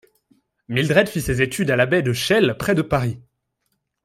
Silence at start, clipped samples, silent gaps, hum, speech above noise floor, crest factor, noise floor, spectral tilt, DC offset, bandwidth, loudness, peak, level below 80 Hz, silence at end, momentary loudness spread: 0.7 s; under 0.1%; none; none; 54 dB; 18 dB; -73 dBFS; -5.5 dB/octave; under 0.1%; 16 kHz; -19 LUFS; -2 dBFS; -44 dBFS; 0.85 s; 6 LU